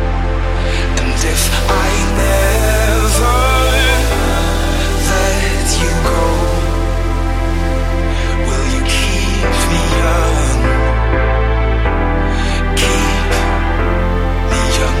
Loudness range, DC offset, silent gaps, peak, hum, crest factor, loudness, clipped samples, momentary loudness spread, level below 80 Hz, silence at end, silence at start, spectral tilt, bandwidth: 3 LU; under 0.1%; none; 0 dBFS; none; 12 dB; -15 LUFS; under 0.1%; 5 LU; -16 dBFS; 0 s; 0 s; -4.5 dB/octave; 16 kHz